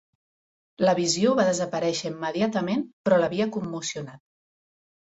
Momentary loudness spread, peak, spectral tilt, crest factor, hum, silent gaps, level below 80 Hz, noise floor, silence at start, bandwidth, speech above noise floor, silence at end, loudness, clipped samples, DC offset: 9 LU; -8 dBFS; -4.5 dB/octave; 18 dB; none; 2.93-3.04 s; -66 dBFS; under -90 dBFS; 0.8 s; 8.2 kHz; over 66 dB; 0.95 s; -25 LUFS; under 0.1%; under 0.1%